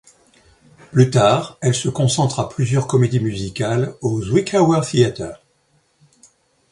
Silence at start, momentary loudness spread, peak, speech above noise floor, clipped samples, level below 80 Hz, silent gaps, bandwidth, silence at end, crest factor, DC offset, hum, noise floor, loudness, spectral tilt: 0.9 s; 7 LU; 0 dBFS; 44 dB; under 0.1%; -48 dBFS; none; 11.5 kHz; 1.35 s; 18 dB; under 0.1%; none; -61 dBFS; -18 LUFS; -6 dB/octave